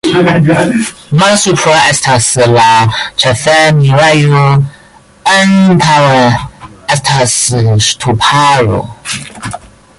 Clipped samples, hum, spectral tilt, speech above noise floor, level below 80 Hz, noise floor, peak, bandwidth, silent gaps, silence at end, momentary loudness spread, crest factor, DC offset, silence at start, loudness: under 0.1%; none; -4.5 dB/octave; 32 dB; -38 dBFS; -39 dBFS; 0 dBFS; 11.5 kHz; none; 0.4 s; 13 LU; 8 dB; under 0.1%; 0.05 s; -8 LUFS